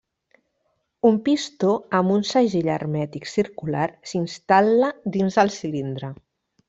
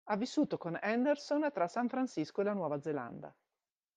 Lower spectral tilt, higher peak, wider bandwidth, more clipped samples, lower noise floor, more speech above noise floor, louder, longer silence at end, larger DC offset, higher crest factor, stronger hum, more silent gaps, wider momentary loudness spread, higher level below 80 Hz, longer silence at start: about the same, -6 dB/octave vs -6 dB/octave; first, -2 dBFS vs -20 dBFS; second, 8 kHz vs 9.4 kHz; neither; second, -72 dBFS vs under -90 dBFS; second, 51 dB vs over 55 dB; first, -22 LUFS vs -35 LUFS; about the same, 0.55 s vs 0.65 s; neither; about the same, 20 dB vs 16 dB; neither; neither; about the same, 10 LU vs 8 LU; first, -62 dBFS vs -82 dBFS; first, 1.05 s vs 0.05 s